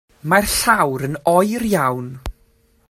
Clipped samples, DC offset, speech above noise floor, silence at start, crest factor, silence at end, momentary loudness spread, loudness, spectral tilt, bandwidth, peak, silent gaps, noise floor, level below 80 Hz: under 0.1%; under 0.1%; 40 dB; 0.25 s; 18 dB; 0.6 s; 16 LU; -17 LUFS; -4 dB/octave; 16 kHz; 0 dBFS; none; -57 dBFS; -40 dBFS